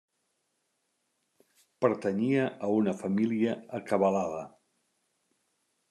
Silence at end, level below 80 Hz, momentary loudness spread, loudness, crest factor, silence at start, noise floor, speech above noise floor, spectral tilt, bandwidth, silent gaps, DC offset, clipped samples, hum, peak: 1.4 s; -80 dBFS; 9 LU; -29 LUFS; 20 dB; 1.8 s; -78 dBFS; 50 dB; -7.5 dB/octave; 11.5 kHz; none; under 0.1%; under 0.1%; none; -12 dBFS